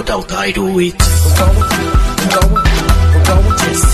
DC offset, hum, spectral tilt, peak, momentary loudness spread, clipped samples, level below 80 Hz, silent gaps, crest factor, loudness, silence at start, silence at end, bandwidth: under 0.1%; none; -4.5 dB/octave; 0 dBFS; 5 LU; under 0.1%; -14 dBFS; none; 10 dB; -12 LUFS; 0 s; 0 s; 14 kHz